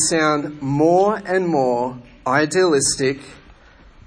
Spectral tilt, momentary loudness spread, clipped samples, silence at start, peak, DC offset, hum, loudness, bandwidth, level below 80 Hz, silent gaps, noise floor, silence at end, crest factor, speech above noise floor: -4 dB/octave; 8 LU; under 0.1%; 0 s; -4 dBFS; under 0.1%; none; -18 LUFS; 10.5 kHz; -50 dBFS; none; -47 dBFS; 0.7 s; 14 dB; 29 dB